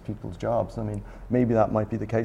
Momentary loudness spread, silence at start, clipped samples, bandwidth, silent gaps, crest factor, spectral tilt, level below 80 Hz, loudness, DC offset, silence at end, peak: 12 LU; 0 s; under 0.1%; 10 kHz; none; 18 dB; -9 dB/octave; -44 dBFS; -26 LUFS; under 0.1%; 0 s; -8 dBFS